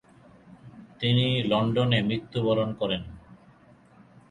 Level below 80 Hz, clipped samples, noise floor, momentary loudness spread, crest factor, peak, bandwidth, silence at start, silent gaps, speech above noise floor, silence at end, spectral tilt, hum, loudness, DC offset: -56 dBFS; under 0.1%; -55 dBFS; 7 LU; 18 dB; -10 dBFS; 9.6 kHz; 0.5 s; none; 31 dB; 0.95 s; -7.5 dB/octave; none; -26 LUFS; under 0.1%